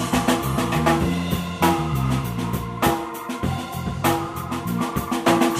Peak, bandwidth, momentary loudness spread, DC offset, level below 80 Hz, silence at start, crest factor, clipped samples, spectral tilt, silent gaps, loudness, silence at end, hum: -4 dBFS; 16 kHz; 7 LU; under 0.1%; -38 dBFS; 0 s; 18 dB; under 0.1%; -5.5 dB/octave; none; -23 LUFS; 0 s; none